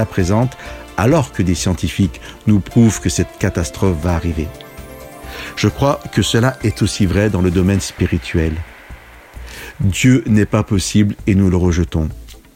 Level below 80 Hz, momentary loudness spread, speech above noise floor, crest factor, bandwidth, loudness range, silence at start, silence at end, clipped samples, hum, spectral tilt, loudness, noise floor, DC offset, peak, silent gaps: -30 dBFS; 18 LU; 22 dB; 14 dB; 16.5 kHz; 3 LU; 0 s; 0.2 s; under 0.1%; none; -6 dB/octave; -16 LUFS; -37 dBFS; under 0.1%; -2 dBFS; none